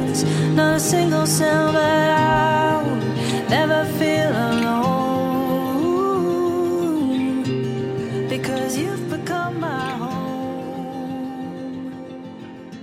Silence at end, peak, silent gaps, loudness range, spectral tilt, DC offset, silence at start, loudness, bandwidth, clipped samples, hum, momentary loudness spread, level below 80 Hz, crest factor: 0 s; -6 dBFS; none; 9 LU; -5 dB/octave; under 0.1%; 0 s; -20 LUFS; 16 kHz; under 0.1%; none; 13 LU; -52 dBFS; 14 dB